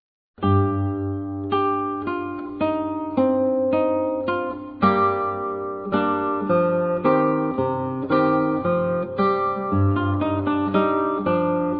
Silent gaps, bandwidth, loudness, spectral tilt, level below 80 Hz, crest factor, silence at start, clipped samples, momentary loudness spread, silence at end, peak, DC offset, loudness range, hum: none; 5 kHz; -22 LUFS; -11 dB/octave; -56 dBFS; 16 dB; 0.4 s; under 0.1%; 7 LU; 0 s; -4 dBFS; under 0.1%; 2 LU; none